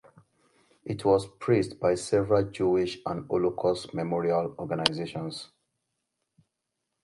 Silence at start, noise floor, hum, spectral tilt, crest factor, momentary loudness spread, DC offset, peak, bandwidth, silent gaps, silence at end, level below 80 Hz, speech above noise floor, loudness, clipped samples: 0.85 s; -83 dBFS; none; -5.5 dB/octave; 28 dB; 11 LU; under 0.1%; 0 dBFS; 11.5 kHz; none; 1.6 s; -58 dBFS; 56 dB; -28 LUFS; under 0.1%